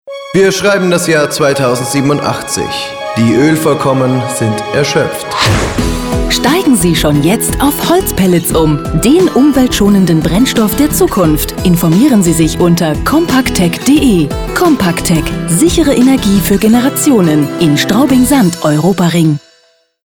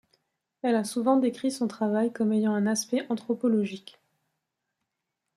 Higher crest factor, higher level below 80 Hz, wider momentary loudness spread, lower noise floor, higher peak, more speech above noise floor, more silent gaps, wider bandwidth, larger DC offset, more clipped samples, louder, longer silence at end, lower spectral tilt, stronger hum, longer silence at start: second, 10 dB vs 18 dB; first, -26 dBFS vs -76 dBFS; about the same, 5 LU vs 6 LU; second, -51 dBFS vs -84 dBFS; first, 0 dBFS vs -10 dBFS; second, 42 dB vs 57 dB; neither; first, over 20 kHz vs 13 kHz; neither; neither; first, -10 LUFS vs -27 LUFS; second, 0.7 s vs 1.55 s; about the same, -5 dB/octave vs -5 dB/octave; neither; second, 0.05 s vs 0.65 s